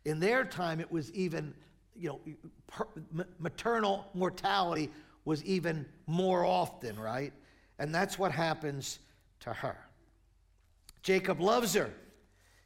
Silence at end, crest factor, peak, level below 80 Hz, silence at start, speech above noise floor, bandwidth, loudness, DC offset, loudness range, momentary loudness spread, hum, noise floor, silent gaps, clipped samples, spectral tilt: 0.65 s; 18 dB; -16 dBFS; -64 dBFS; 0.05 s; 33 dB; 16.5 kHz; -34 LUFS; under 0.1%; 4 LU; 14 LU; none; -67 dBFS; none; under 0.1%; -5 dB/octave